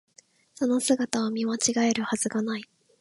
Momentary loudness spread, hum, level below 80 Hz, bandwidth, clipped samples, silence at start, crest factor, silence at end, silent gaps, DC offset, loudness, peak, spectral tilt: 7 LU; none; -70 dBFS; 11.5 kHz; under 0.1%; 0.6 s; 24 dB; 0.35 s; none; under 0.1%; -26 LUFS; -4 dBFS; -3 dB/octave